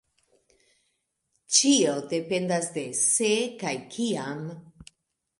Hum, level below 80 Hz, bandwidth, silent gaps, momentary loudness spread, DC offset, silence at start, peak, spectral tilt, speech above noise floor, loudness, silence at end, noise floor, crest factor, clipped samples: none; -70 dBFS; 11.5 kHz; none; 14 LU; under 0.1%; 1.5 s; -4 dBFS; -2.5 dB/octave; 50 dB; -25 LUFS; 0.55 s; -76 dBFS; 24 dB; under 0.1%